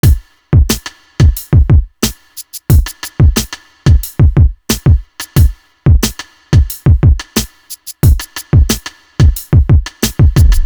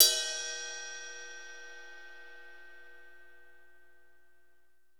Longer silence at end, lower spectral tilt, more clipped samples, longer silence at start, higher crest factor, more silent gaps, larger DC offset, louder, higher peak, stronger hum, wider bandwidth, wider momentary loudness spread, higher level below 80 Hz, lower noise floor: second, 0 s vs 2.05 s; first, -5.5 dB/octave vs 3 dB/octave; neither; about the same, 0.05 s vs 0 s; second, 10 dB vs 32 dB; neither; second, under 0.1% vs 0.3%; first, -12 LUFS vs -33 LUFS; first, 0 dBFS vs -4 dBFS; second, none vs 60 Hz at -80 dBFS; about the same, over 20 kHz vs over 20 kHz; second, 11 LU vs 22 LU; first, -14 dBFS vs -78 dBFS; second, -31 dBFS vs -73 dBFS